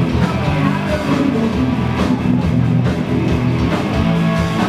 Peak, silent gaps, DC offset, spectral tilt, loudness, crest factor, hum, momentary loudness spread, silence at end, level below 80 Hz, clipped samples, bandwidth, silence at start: -2 dBFS; none; under 0.1%; -7.5 dB/octave; -16 LUFS; 14 dB; none; 2 LU; 0 s; -30 dBFS; under 0.1%; 14 kHz; 0 s